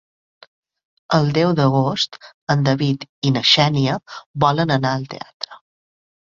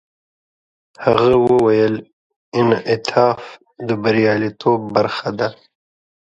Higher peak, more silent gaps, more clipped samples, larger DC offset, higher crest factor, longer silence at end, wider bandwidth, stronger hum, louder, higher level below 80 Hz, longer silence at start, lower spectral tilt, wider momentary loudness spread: about the same, -2 dBFS vs 0 dBFS; first, 2.34-2.47 s, 3.09-3.22 s, 4.26-4.34 s, 5.34-5.40 s vs 2.13-2.30 s, 2.36-2.52 s; neither; neither; about the same, 18 dB vs 18 dB; second, 0.65 s vs 0.85 s; second, 7.4 kHz vs 8.2 kHz; neither; about the same, -18 LUFS vs -17 LUFS; about the same, -54 dBFS vs -52 dBFS; about the same, 1.1 s vs 1 s; second, -5.5 dB/octave vs -7 dB/octave; first, 17 LU vs 11 LU